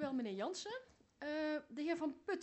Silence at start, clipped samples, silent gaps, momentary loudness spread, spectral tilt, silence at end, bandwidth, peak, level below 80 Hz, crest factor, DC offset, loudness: 0 s; under 0.1%; none; 8 LU; -4 dB/octave; 0 s; 8.2 kHz; -28 dBFS; -80 dBFS; 14 dB; under 0.1%; -43 LUFS